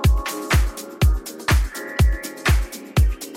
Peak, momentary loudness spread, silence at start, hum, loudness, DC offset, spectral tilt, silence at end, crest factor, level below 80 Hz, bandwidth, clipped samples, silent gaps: -6 dBFS; 4 LU; 0 s; none; -22 LUFS; under 0.1%; -5 dB/octave; 0 s; 14 dB; -22 dBFS; 16.5 kHz; under 0.1%; none